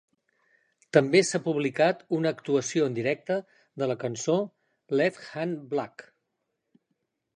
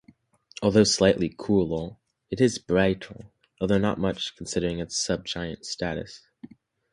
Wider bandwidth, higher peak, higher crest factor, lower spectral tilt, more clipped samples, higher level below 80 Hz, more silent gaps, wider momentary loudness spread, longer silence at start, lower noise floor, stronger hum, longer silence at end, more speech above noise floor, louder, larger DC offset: about the same, 10.5 kHz vs 11.5 kHz; about the same, -4 dBFS vs -6 dBFS; about the same, 24 dB vs 20 dB; about the same, -5 dB/octave vs -4.5 dB/octave; neither; second, -76 dBFS vs -50 dBFS; neither; second, 10 LU vs 15 LU; first, 0.95 s vs 0.6 s; first, -80 dBFS vs -57 dBFS; neither; first, 1.35 s vs 0.45 s; first, 54 dB vs 32 dB; about the same, -27 LUFS vs -25 LUFS; neither